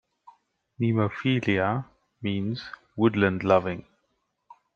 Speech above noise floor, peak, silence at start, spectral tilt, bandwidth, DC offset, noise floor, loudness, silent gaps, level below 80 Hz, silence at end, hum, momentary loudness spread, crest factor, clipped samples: 51 dB; -6 dBFS; 0.8 s; -8 dB/octave; 7 kHz; under 0.1%; -75 dBFS; -26 LUFS; none; -64 dBFS; 0.95 s; none; 13 LU; 22 dB; under 0.1%